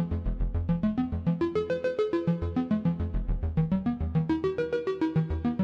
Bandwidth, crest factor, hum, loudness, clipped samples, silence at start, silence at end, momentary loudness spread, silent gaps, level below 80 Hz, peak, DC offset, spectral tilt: 6.4 kHz; 12 dB; none; -29 LUFS; under 0.1%; 0 s; 0 s; 4 LU; none; -36 dBFS; -14 dBFS; under 0.1%; -9.5 dB/octave